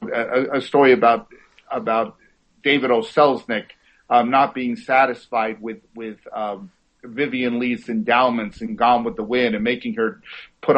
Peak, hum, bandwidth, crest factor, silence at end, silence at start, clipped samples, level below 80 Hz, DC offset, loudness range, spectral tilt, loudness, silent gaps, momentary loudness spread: -2 dBFS; none; 8.4 kHz; 18 dB; 0 s; 0 s; under 0.1%; -58 dBFS; under 0.1%; 4 LU; -6.5 dB/octave; -20 LUFS; none; 15 LU